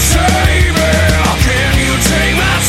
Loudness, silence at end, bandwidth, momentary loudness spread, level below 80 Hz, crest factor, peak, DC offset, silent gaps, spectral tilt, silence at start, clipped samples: -11 LUFS; 0 s; 16.5 kHz; 1 LU; -16 dBFS; 10 dB; 0 dBFS; under 0.1%; none; -4 dB/octave; 0 s; under 0.1%